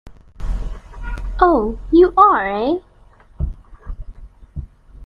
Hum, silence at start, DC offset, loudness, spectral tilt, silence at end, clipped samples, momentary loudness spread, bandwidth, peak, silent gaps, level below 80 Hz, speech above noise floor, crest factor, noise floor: none; 0.05 s; under 0.1%; -16 LUFS; -8.5 dB/octave; 0 s; under 0.1%; 24 LU; 5.4 kHz; 0 dBFS; none; -30 dBFS; 34 dB; 18 dB; -48 dBFS